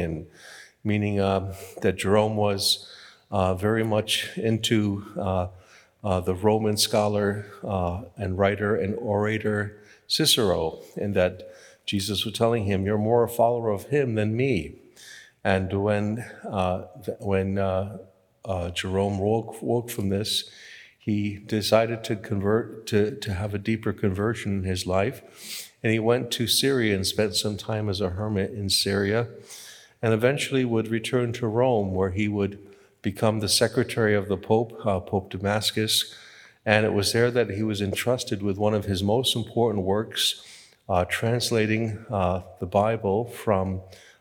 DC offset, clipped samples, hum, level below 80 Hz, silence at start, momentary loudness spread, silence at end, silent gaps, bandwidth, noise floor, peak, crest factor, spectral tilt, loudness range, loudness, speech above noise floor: under 0.1%; under 0.1%; none; -60 dBFS; 0 s; 11 LU; 0.25 s; none; 19 kHz; -48 dBFS; -2 dBFS; 24 dB; -4.5 dB/octave; 3 LU; -25 LUFS; 23 dB